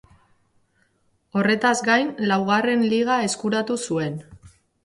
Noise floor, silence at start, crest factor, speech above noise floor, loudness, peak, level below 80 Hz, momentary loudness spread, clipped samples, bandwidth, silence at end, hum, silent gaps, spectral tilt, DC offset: -66 dBFS; 1.35 s; 18 dB; 45 dB; -21 LUFS; -6 dBFS; -62 dBFS; 7 LU; under 0.1%; 11.5 kHz; 0.35 s; none; none; -4.5 dB/octave; under 0.1%